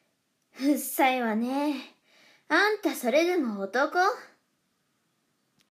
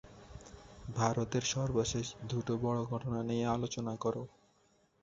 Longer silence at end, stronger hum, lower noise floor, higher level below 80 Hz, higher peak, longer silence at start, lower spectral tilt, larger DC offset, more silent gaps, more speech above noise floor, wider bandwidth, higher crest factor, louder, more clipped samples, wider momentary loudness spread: first, 1.45 s vs 0.75 s; neither; about the same, -74 dBFS vs -71 dBFS; second, under -90 dBFS vs -58 dBFS; first, -10 dBFS vs -16 dBFS; first, 0.55 s vs 0.05 s; second, -3.5 dB/octave vs -6 dB/octave; neither; neither; first, 48 dB vs 36 dB; first, 15.5 kHz vs 7.8 kHz; about the same, 18 dB vs 20 dB; first, -26 LUFS vs -35 LUFS; neither; second, 7 LU vs 19 LU